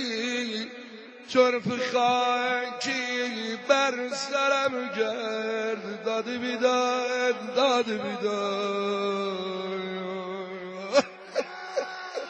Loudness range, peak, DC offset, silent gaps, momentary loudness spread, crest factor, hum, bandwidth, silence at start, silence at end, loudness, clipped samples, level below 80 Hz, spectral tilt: 4 LU; -8 dBFS; under 0.1%; none; 10 LU; 20 dB; none; 9 kHz; 0 s; 0 s; -27 LUFS; under 0.1%; -76 dBFS; -3.5 dB/octave